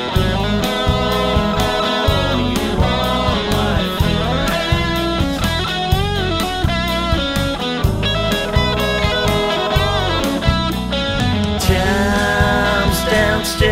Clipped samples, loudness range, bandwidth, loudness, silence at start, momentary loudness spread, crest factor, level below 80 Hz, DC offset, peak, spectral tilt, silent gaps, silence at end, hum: under 0.1%; 2 LU; 16 kHz; -17 LUFS; 0 s; 3 LU; 14 dB; -24 dBFS; under 0.1%; -2 dBFS; -5 dB/octave; none; 0 s; none